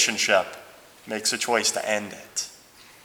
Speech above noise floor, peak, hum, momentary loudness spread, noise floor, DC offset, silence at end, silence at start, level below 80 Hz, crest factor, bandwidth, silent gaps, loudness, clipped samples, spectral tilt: 25 dB; -6 dBFS; none; 14 LU; -51 dBFS; under 0.1%; 0.2 s; 0 s; -70 dBFS; 22 dB; over 20 kHz; none; -24 LUFS; under 0.1%; -0.5 dB/octave